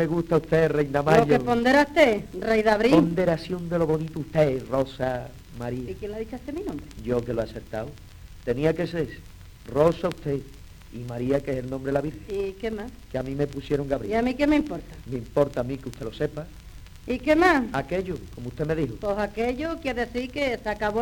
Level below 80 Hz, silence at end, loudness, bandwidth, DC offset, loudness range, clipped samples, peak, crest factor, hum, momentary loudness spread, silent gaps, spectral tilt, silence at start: -44 dBFS; 0 s; -25 LUFS; 19.5 kHz; under 0.1%; 9 LU; under 0.1%; -4 dBFS; 20 dB; none; 15 LU; none; -6.5 dB/octave; 0 s